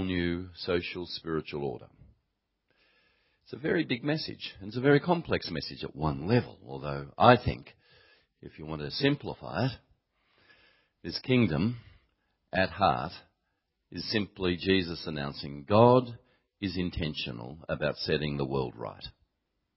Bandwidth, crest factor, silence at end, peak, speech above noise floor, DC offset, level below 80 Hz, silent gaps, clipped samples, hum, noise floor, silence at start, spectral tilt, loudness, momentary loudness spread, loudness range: 5.8 kHz; 28 dB; 0.65 s; -4 dBFS; 51 dB; under 0.1%; -52 dBFS; none; under 0.1%; none; -80 dBFS; 0 s; -10 dB/octave; -30 LUFS; 17 LU; 7 LU